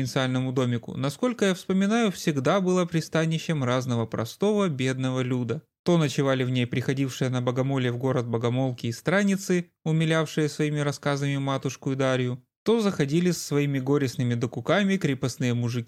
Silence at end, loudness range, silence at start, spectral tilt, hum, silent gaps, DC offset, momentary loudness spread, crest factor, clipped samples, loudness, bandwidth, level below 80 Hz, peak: 0 s; 1 LU; 0 s; -6 dB/octave; none; 5.79-5.84 s, 12.56-12.66 s; under 0.1%; 5 LU; 16 dB; under 0.1%; -26 LUFS; 15 kHz; -66 dBFS; -10 dBFS